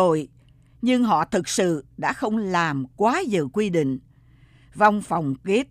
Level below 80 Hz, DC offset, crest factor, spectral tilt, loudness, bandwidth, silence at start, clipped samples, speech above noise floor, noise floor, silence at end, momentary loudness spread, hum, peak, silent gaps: -56 dBFS; under 0.1%; 18 dB; -5 dB/octave; -23 LUFS; 14.5 kHz; 0 s; under 0.1%; 31 dB; -53 dBFS; 0.05 s; 7 LU; none; -4 dBFS; none